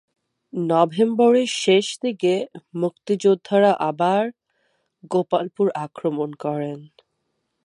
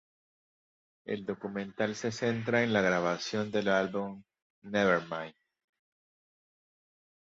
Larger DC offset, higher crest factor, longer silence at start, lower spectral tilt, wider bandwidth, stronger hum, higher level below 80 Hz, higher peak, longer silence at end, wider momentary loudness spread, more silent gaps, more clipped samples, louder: neither; about the same, 20 dB vs 20 dB; second, 0.55 s vs 1.05 s; about the same, -5.5 dB/octave vs -5 dB/octave; first, 11.5 kHz vs 8 kHz; neither; second, -76 dBFS vs -70 dBFS; first, -2 dBFS vs -12 dBFS; second, 0.8 s vs 2 s; about the same, 11 LU vs 12 LU; second, none vs 4.42-4.62 s; neither; first, -21 LUFS vs -31 LUFS